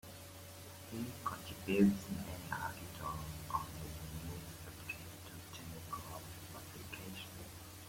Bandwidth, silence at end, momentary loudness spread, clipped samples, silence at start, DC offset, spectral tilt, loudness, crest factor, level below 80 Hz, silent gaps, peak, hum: 16.5 kHz; 0 s; 14 LU; under 0.1%; 0.05 s; under 0.1%; -5.5 dB/octave; -43 LUFS; 24 dB; -60 dBFS; none; -18 dBFS; none